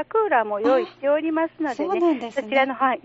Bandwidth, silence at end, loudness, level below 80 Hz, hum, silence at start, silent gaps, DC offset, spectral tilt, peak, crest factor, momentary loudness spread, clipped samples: 8 kHz; 0.05 s; -22 LUFS; -70 dBFS; none; 0 s; none; under 0.1%; -2 dB/octave; -6 dBFS; 14 dB; 5 LU; under 0.1%